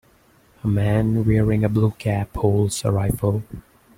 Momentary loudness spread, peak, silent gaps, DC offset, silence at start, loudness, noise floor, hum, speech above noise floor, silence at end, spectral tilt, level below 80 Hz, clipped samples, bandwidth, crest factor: 9 LU; -4 dBFS; none; under 0.1%; 0.65 s; -21 LUFS; -56 dBFS; none; 36 dB; 0.35 s; -7 dB/octave; -40 dBFS; under 0.1%; 15.5 kHz; 16 dB